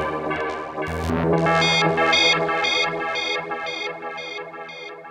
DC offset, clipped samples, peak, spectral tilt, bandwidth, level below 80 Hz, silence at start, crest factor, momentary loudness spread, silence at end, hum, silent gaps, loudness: under 0.1%; under 0.1%; -6 dBFS; -4 dB/octave; 12.5 kHz; -46 dBFS; 0 s; 16 dB; 16 LU; 0 s; none; none; -21 LUFS